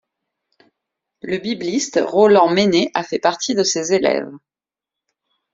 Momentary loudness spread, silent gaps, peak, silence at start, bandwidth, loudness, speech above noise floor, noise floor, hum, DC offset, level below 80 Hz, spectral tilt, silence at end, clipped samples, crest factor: 12 LU; none; 0 dBFS; 1.25 s; 7.8 kHz; -17 LUFS; 71 dB; -88 dBFS; none; under 0.1%; -60 dBFS; -4 dB/octave; 1.15 s; under 0.1%; 18 dB